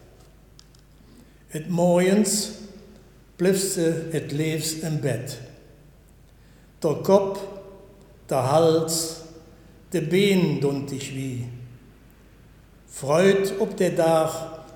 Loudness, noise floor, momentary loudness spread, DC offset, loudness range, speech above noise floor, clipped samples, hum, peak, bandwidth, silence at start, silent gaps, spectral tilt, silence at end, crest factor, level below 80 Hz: -23 LUFS; -52 dBFS; 17 LU; under 0.1%; 4 LU; 30 dB; under 0.1%; none; -4 dBFS; 19 kHz; 1.5 s; none; -5 dB/octave; 0 s; 22 dB; -54 dBFS